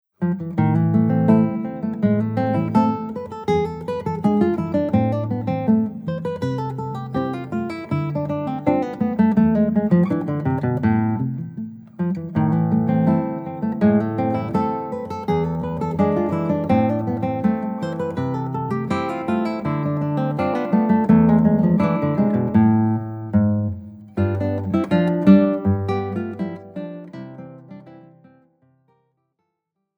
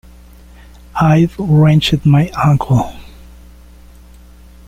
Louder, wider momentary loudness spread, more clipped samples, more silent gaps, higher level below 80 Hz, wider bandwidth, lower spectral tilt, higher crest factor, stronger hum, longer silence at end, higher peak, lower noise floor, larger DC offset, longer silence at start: second, -20 LUFS vs -12 LUFS; first, 11 LU vs 6 LU; neither; neither; second, -50 dBFS vs -36 dBFS; second, 6.2 kHz vs 9.2 kHz; first, -10 dB/octave vs -7.5 dB/octave; first, 18 dB vs 12 dB; neither; first, 2 s vs 1.65 s; about the same, -2 dBFS vs -2 dBFS; first, -78 dBFS vs -39 dBFS; neither; second, 0.2 s vs 0.95 s